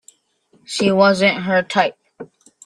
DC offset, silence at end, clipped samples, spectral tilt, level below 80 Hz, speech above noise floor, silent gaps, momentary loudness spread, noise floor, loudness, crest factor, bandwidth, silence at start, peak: under 0.1%; 0.4 s; under 0.1%; -4.5 dB/octave; -62 dBFS; 43 dB; none; 8 LU; -59 dBFS; -17 LUFS; 18 dB; 11.5 kHz; 0.7 s; 0 dBFS